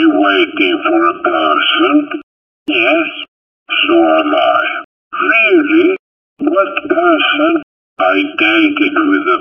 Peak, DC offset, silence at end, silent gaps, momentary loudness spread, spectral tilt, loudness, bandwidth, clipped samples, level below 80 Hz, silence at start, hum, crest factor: 0 dBFS; under 0.1%; 0 s; 2.23-2.66 s, 3.28-3.66 s, 4.84-5.11 s, 5.99-6.36 s, 7.63-7.96 s; 10 LU; -5.5 dB/octave; -12 LUFS; 5.6 kHz; under 0.1%; -60 dBFS; 0 s; none; 12 dB